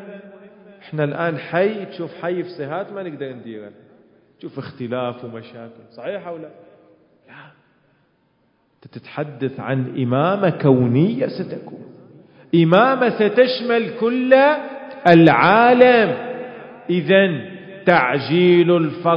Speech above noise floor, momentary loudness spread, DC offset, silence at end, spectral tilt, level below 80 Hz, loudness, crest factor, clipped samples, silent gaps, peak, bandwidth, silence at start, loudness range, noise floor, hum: 45 dB; 21 LU; under 0.1%; 0 s; -9 dB/octave; -64 dBFS; -17 LUFS; 18 dB; under 0.1%; none; 0 dBFS; 5.4 kHz; 0 s; 19 LU; -62 dBFS; none